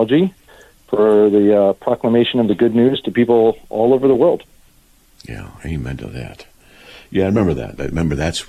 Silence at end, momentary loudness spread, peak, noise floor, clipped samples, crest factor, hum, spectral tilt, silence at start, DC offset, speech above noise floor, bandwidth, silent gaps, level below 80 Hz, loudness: 0.05 s; 17 LU; -4 dBFS; -51 dBFS; under 0.1%; 14 dB; none; -7 dB/octave; 0 s; under 0.1%; 36 dB; 13.5 kHz; none; -38 dBFS; -16 LUFS